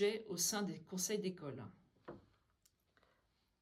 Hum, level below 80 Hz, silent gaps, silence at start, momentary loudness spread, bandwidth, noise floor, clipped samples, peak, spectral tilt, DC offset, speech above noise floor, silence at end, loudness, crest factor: none; -80 dBFS; none; 0 s; 20 LU; 16 kHz; -80 dBFS; under 0.1%; -24 dBFS; -3 dB/octave; under 0.1%; 39 dB; 1.4 s; -40 LUFS; 20 dB